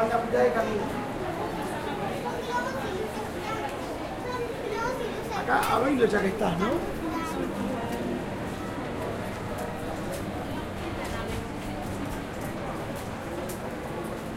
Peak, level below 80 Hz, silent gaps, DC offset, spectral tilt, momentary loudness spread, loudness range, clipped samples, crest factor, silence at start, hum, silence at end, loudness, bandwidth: -10 dBFS; -46 dBFS; none; under 0.1%; -5.5 dB/octave; 10 LU; 6 LU; under 0.1%; 20 dB; 0 s; none; 0 s; -30 LUFS; 16 kHz